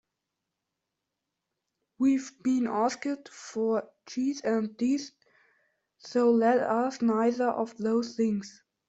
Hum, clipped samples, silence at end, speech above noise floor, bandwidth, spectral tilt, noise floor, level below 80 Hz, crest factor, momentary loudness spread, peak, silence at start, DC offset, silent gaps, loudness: none; under 0.1%; 0.4 s; 58 dB; 8 kHz; -5.5 dB/octave; -85 dBFS; -74 dBFS; 16 dB; 10 LU; -14 dBFS; 2 s; under 0.1%; none; -28 LUFS